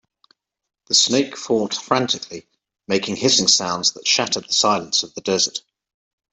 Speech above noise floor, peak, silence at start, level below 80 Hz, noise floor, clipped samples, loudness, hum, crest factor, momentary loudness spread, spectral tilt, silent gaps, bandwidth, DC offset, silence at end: 41 dB; -2 dBFS; 0.9 s; -64 dBFS; -61 dBFS; under 0.1%; -18 LUFS; none; 20 dB; 8 LU; -2 dB/octave; none; 8.4 kHz; under 0.1%; 0.75 s